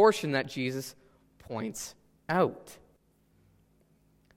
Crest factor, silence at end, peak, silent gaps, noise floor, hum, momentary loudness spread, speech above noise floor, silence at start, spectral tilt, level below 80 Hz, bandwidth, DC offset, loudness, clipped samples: 22 dB; 1.6 s; -10 dBFS; none; -67 dBFS; none; 19 LU; 38 dB; 0 s; -5 dB/octave; -68 dBFS; 16 kHz; under 0.1%; -32 LUFS; under 0.1%